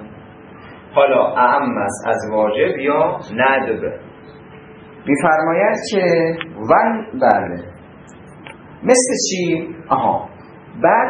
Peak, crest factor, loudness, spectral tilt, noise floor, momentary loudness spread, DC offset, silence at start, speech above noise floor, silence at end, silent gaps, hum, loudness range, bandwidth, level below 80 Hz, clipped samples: 0 dBFS; 18 dB; -17 LUFS; -4 dB/octave; -40 dBFS; 17 LU; under 0.1%; 0 s; 24 dB; 0 s; none; none; 3 LU; 11 kHz; -56 dBFS; under 0.1%